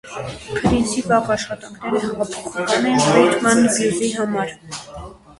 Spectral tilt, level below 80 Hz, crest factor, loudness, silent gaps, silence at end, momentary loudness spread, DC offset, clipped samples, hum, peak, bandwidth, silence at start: -4 dB/octave; -42 dBFS; 18 dB; -18 LUFS; none; 0.25 s; 16 LU; under 0.1%; under 0.1%; none; 0 dBFS; 11.5 kHz; 0.05 s